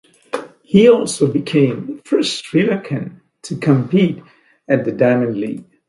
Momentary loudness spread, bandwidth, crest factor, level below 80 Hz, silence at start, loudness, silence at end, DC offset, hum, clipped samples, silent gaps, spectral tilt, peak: 16 LU; 11.5 kHz; 16 dB; -56 dBFS; 0.35 s; -16 LUFS; 0.25 s; under 0.1%; none; under 0.1%; none; -6 dB/octave; 0 dBFS